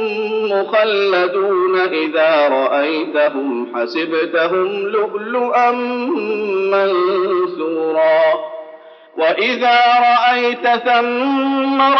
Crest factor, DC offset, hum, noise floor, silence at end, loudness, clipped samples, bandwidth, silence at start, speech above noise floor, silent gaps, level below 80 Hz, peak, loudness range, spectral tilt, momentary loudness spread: 12 dB; under 0.1%; none; -39 dBFS; 0 s; -15 LUFS; under 0.1%; 6.4 kHz; 0 s; 24 dB; none; -86 dBFS; -4 dBFS; 3 LU; -1 dB/octave; 7 LU